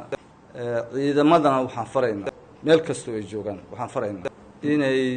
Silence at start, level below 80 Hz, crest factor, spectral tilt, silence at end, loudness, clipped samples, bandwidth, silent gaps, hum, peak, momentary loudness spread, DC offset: 0 s; -60 dBFS; 18 dB; -6 dB/octave; 0 s; -24 LUFS; under 0.1%; 9.4 kHz; none; none; -6 dBFS; 16 LU; under 0.1%